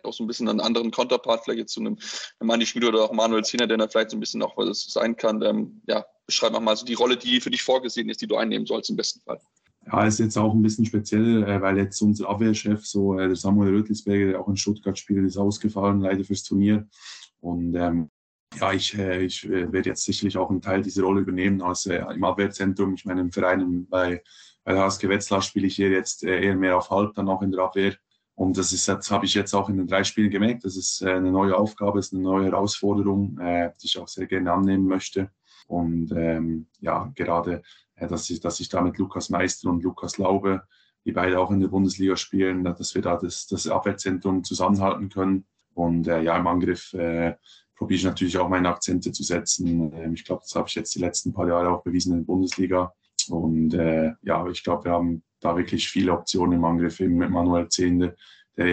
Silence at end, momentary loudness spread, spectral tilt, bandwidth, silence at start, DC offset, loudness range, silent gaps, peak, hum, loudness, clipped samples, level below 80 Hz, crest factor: 0 s; 7 LU; -4.5 dB/octave; 9.2 kHz; 0.05 s; under 0.1%; 3 LU; 18.09-18.47 s; -6 dBFS; none; -24 LUFS; under 0.1%; -54 dBFS; 18 dB